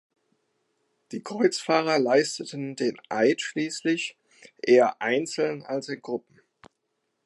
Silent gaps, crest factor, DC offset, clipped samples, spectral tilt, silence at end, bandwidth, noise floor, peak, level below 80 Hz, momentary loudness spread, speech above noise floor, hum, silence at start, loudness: none; 20 dB; under 0.1%; under 0.1%; -4 dB/octave; 1.05 s; 11.5 kHz; -78 dBFS; -6 dBFS; -80 dBFS; 14 LU; 53 dB; none; 1.1 s; -25 LUFS